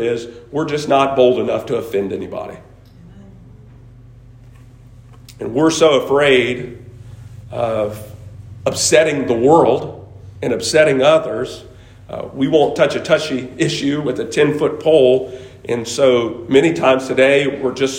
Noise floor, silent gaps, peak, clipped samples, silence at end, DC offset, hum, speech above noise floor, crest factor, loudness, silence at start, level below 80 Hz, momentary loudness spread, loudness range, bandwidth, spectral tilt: -41 dBFS; none; 0 dBFS; under 0.1%; 0 s; under 0.1%; none; 26 dB; 16 dB; -15 LUFS; 0 s; -48 dBFS; 18 LU; 7 LU; 16.5 kHz; -4.5 dB/octave